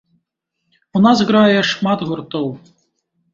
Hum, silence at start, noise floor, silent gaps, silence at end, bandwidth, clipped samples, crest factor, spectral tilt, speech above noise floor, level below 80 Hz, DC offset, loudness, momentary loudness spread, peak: none; 0.95 s; -74 dBFS; none; 0.75 s; 7.6 kHz; under 0.1%; 16 dB; -6 dB/octave; 59 dB; -58 dBFS; under 0.1%; -15 LUFS; 12 LU; -2 dBFS